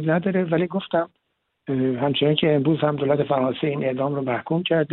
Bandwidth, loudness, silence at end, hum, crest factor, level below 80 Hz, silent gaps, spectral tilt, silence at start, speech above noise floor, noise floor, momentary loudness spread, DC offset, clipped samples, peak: 4.2 kHz; -22 LUFS; 0 s; none; 18 dB; -62 dBFS; none; -11.5 dB/octave; 0 s; 53 dB; -74 dBFS; 6 LU; under 0.1%; under 0.1%; -4 dBFS